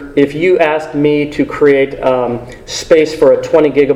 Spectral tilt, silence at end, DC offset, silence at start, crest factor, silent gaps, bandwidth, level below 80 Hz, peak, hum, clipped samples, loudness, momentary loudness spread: -5.5 dB/octave; 0 s; under 0.1%; 0 s; 12 dB; none; 12 kHz; -40 dBFS; 0 dBFS; none; 0.2%; -12 LUFS; 8 LU